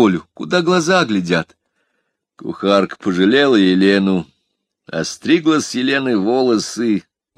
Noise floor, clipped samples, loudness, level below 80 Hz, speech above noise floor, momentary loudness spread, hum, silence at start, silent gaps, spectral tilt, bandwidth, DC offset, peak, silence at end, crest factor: -72 dBFS; under 0.1%; -16 LUFS; -60 dBFS; 56 dB; 11 LU; none; 0 s; none; -5 dB/octave; 12.5 kHz; under 0.1%; 0 dBFS; 0.4 s; 16 dB